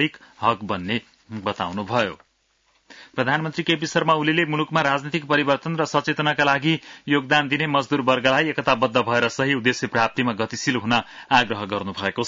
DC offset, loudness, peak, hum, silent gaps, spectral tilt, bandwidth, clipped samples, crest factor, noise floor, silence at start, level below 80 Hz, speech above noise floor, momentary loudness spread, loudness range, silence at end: under 0.1%; -21 LUFS; -4 dBFS; none; none; -5 dB/octave; 7.8 kHz; under 0.1%; 18 dB; -66 dBFS; 0 s; -60 dBFS; 44 dB; 7 LU; 5 LU; 0 s